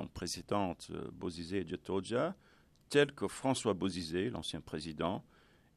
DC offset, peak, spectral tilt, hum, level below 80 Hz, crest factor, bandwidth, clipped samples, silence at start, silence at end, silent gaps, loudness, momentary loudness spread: under 0.1%; -14 dBFS; -5 dB/octave; none; -64 dBFS; 22 dB; 13.5 kHz; under 0.1%; 0 s; 0.55 s; none; -37 LUFS; 11 LU